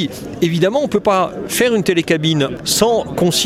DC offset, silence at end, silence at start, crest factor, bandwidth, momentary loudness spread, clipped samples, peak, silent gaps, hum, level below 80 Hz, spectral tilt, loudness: under 0.1%; 0 s; 0 s; 16 dB; 16.5 kHz; 4 LU; under 0.1%; 0 dBFS; none; none; -46 dBFS; -4 dB/octave; -16 LUFS